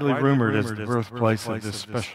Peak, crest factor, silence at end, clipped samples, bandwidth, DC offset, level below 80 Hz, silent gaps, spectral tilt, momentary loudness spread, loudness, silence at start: -6 dBFS; 18 dB; 0 s; under 0.1%; 15 kHz; under 0.1%; -62 dBFS; none; -6.5 dB/octave; 9 LU; -24 LUFS; 0 s